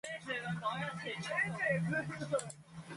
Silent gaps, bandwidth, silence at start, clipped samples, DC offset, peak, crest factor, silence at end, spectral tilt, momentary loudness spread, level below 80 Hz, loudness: none; 11.5 kHz; 0.05 s; under 0.1%; under 0.1%; -22 dBFS; 16 dB; 0 s; -5 dB/octave; 7 LU; -72 dBFS; -37 LUFS